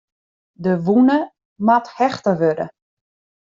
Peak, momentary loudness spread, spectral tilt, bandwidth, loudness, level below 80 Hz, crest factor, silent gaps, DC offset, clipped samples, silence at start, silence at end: -2 dBFS; 12 LU; -6.5 dB/octave; 7.4 kHz; -18 LUFS; -62 dBFS; 16 dB; 1.45-1.56 s; under 0.1%; under 0.1%; 0.6 s; 0.8 s